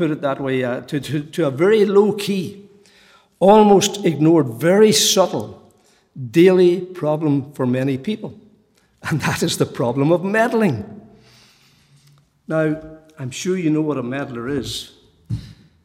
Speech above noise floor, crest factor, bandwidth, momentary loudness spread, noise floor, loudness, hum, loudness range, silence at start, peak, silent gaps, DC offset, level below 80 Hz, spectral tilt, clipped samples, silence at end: 40 dB; 18 dB; 16.5 kHz; 17 LU; -57 dBFS; -17 LUFS; none; 9 LU; 0 s; -2 dBFS; none; under 0.1%; -54 dBFS; -5 dB/octave; under 0.1%; 0.3 s